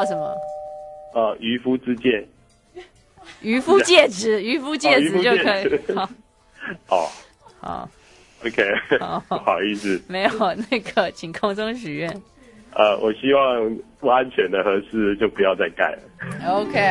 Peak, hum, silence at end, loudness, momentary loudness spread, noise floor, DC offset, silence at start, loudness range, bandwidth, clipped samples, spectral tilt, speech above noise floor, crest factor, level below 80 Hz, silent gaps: 0 dBFS; none; 0 s; -20 LUFS; 15 LU; -47 dBFS; under 0.1%; 0 s; 7 LU; 11.5 kHz; under 0.1%; -4 dB/octave; 26 dB; 22 dB; -56 dBFS; none